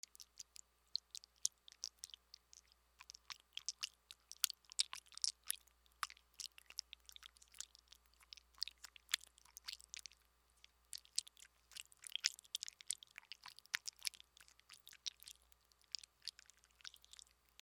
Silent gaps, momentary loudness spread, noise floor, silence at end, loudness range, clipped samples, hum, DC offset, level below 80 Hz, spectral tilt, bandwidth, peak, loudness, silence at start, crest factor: none; 21 LU; -76 dBFS; 0.7 s; 7 LU; under 0.1%; none; under 0.1%; -80 dBFS; 4 dB/octave; over 20 kHz; -8 dBFS; -47 LUFS; 0.2 s; 42 dB